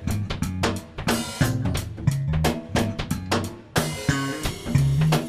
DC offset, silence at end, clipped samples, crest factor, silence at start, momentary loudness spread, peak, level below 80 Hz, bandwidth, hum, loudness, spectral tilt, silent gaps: under 0.1%; 0 s; under 0.1%; 18 dB; 0 s; 6 LU; -6 dBFS; -36 dBFS; 15.5 kHz; none; -25 LUFS; -5.5 dB/octave; none